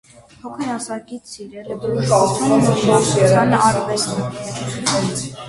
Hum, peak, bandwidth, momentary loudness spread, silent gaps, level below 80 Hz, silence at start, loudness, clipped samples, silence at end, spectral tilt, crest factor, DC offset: none; -2 dBFS; 11.5 kHz; 19 LU; none; -50 dBFS; 0.45 s; -17 LUFS; under 0.1%; 0 s; -5 dB/octave; 16 dB; under 0.1%